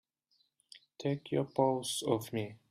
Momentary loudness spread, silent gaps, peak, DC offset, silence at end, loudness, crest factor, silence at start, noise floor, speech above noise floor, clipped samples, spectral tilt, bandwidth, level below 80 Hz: 8 LU; none; -14 dBFS; under 0.1%; 0.15 s; -34 LUFS; 20 dB; 0.75 s; -76 dBFS; 42 dB; under 0.1%; -5 dB/octave; 15.5 kHz; -74 dBFS